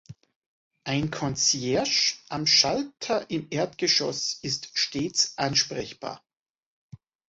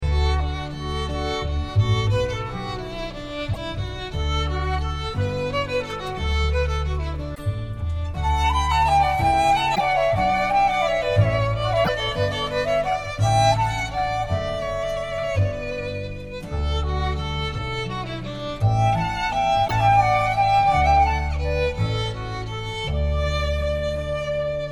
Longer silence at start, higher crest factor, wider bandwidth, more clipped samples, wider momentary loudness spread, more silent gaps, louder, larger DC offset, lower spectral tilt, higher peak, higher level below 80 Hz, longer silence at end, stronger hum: about the same, 0.1 s vs 0 s; first, 22 dB vs 16 dB; second, 8 kHz vs 16 kHz; neither; about the same, 12 LU vs 11 LU; first, 0.36-0.70 s, 6.39-6.44 s, 6.50-6.54 s, 6.66-6.90 s vs none; about the same, -24 LUFS vs -23 LUFS; neither; second, -2.5 dB/octave vs -5.5 dB/octave; about the same, -6 dBFS vs -6 dBFS; second, -60 dBFS vs -30 dBFS; first, 0.3 s vs 0 s; neither